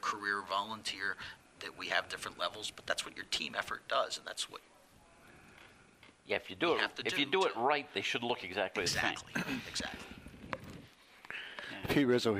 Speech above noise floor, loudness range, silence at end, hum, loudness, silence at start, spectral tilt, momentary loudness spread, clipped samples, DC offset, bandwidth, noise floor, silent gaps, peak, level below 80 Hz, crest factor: 26 dB; 6 LU; 0 s; none; -36 LUFS; 0 s; -3 dB/octave; 14 LU; under 0.1%; under 0.1%; 15.5 kHz; -62 dBFS; none; -14 dBFS; -66 dBFS; 22 dB